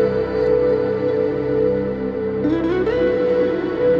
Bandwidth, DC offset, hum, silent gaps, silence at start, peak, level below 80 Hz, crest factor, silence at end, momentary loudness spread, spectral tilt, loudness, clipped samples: 5.8 kHz; under 0.1%; none; none; 0 s; -8 dBFS; -42 dBFS; 10 dB; 0 s; 4 LU; -9 dB/octave; -19 LUFS; under 0.1%